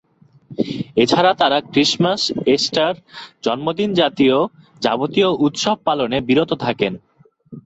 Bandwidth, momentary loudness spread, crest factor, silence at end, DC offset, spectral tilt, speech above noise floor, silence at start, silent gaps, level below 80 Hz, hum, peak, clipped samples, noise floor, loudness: 8.2 kHz; 10 LU; 16 dB; 0.05 s; under 0.1%; -4.5 dB/octave; 26 dB; 0.5 s; none; -56 dBFS; none; -2 dBFS; under 0.1%; -43 dBFS; -18 LUFS